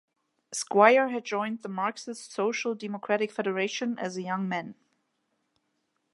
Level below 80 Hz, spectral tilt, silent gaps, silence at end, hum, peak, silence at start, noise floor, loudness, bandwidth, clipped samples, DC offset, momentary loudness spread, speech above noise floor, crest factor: -84 dBFS; -4 dB/octave; none; 1.4 s; none; -4 dBFS; 0.5 s; -77 dBFS; -28 LUFS; 11.5 kHz; under 0.1%; under 0.1%; 15 LU; 49 dB; 24 dB